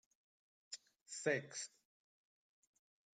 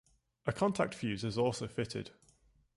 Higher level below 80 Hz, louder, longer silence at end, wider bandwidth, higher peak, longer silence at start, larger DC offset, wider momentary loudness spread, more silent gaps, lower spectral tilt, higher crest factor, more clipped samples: second, under -90 dBFS vs -62 dBFS; second, -45 LUFS vs -36 LUFS; first, 1.5 s vs 0.7 s; second, 9.6 kHz vs 11.5 kHz; second, -24 dBFS vs -14 dBFS; first, 0.7 s vs 0.45 s; neither; first, 14 LU vs 9 LU; first, 1.01-1.06 s vs none; second, -3 dB/octave vs -5.5 dB/octave; about the same, 24 dB vs 22 dB; neither